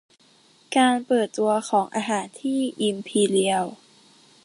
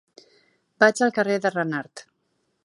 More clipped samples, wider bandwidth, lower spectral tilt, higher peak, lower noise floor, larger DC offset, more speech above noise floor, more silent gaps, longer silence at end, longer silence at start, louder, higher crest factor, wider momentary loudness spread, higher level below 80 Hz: neither; about the same, 11.5 kHz vs 11.5 kHz; about the same, -4 dB/octave vs -4.5 dB/octave; second, -6 dBFS vs -2 dBFS; second, -57 dBFS vs -72 dBFS; neither; second, 35 dB vs 51 dB; neither; about the same, 0.7 s vs 0.65 s; about the same, 0.7 s vs 0.8 s; about the same, -23 LUFS vs -22 LUFS; second, 18 dB vs 24 dB; second, 7 LU vs 12 LU; about the same, -72 dBFS vs -76 dBFS